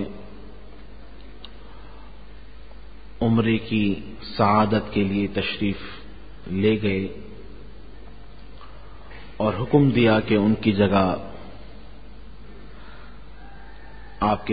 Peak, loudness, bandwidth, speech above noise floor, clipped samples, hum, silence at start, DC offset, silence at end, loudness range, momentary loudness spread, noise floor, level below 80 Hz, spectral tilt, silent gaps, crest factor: -4 dBFS; -22 LUFS; 5 kHz; 23 dB; under 0.1%; none; 0 s; 1%; 0 s; 8 LU; 26 LU; -44 dBFS; -44 dBFS; -11.5 dB/octave; none; 22 dB